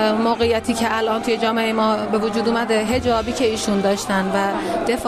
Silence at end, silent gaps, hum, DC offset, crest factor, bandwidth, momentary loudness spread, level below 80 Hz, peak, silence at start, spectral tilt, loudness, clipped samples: 0 s; none; none; under 0.1%; 12 dB; 14 kHz; 2 LU; -44 dBFS; -6 dBFS; 0 s; -4.5 dB/octave; -19 LUFS; under 0.1%